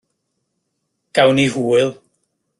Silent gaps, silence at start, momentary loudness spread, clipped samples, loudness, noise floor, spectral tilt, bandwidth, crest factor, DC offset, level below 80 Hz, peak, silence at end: none; 1.15 s; 8 LU; under 0.1%; -16 LUFS; -73 dBFS; -5 dB/octave; 12 kHz; 18 dB; under 0.1%; -58 dBFS; -2 dBFS; 0.65 s